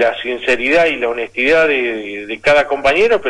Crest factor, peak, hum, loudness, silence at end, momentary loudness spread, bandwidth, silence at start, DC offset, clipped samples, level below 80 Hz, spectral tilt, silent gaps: 12 dB; -4 dBFS; none; -14 LUFS; 0 s; 7 LU; 11.5 kHz; 0 s; under 0.1%; under 0.1%; -44 dBFS; -4 dB/octave; none